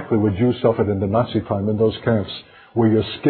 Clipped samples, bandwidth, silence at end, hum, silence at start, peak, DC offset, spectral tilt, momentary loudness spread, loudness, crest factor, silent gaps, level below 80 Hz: under 0.1%; 4.5 kHz; 0 s; none; 0 s; -2 dBFS; under 0.1%; -12.5 dB/octave; 6 LU; -20 LUFS; 16 dB; none; -42 dBFS